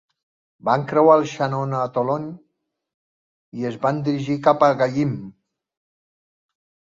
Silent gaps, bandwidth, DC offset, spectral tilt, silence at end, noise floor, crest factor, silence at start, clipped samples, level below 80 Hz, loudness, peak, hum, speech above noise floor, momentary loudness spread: 2.94-3.52 s; 7.6 kHz; under 0.1%; -7.5 dB/octave; 1.55 s; -74 dBFS; 20 dB; 0.65 s; under 0.1%; -64 dBFS; -20 LUFS; -2 dBFS; none; 55 dB; 13 LU